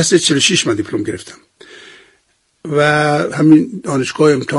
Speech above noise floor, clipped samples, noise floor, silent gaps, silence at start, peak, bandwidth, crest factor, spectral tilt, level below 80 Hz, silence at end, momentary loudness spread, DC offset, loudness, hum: 47 dB; under 0.1%; -60 dBFS; none; 0 s; 0 dBFS; 11.5 kHz; 14 dB; -4 dB/octave; -54 dBFS; 0 s; 11 LU; under 0.1%; -13 LUFS; none